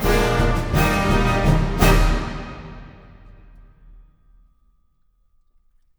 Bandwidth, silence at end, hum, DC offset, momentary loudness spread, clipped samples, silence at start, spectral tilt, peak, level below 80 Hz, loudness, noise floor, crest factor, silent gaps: over 20 kHz; 3.1 s; none; under 0.1%; 19 LU; under 0.1%; 0 s; -5.5 dB/octave; 0 dBFS; -26 dBFS; -19 LUFS; -61 dBFS; 20 dB; none